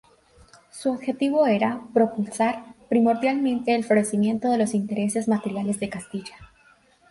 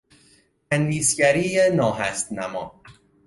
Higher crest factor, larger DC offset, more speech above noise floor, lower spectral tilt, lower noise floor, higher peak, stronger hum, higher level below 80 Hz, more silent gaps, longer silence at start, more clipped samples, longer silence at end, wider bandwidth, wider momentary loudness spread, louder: about the same, 16 dB vs 18 dB; neither; about the same, 35 dB vs 37 dB; first, -5.5 dB/octave vs -4 dB/octave; about the same, -58 dBFS vs -59 dBFS; about the same, -8 dBFS vs -6 dBFS; neither; second, -62 dBFS vs -56 dBFS; neither; about the same, 0.75 s vs 0.7 s; neither; first, 0.65 s vs 0.35 s; about the same, 11.5 kHz vs 11.5 kHz; about the same, 11 LU vs 12 LU; about the same, -23 LUFS vs -21 LUFS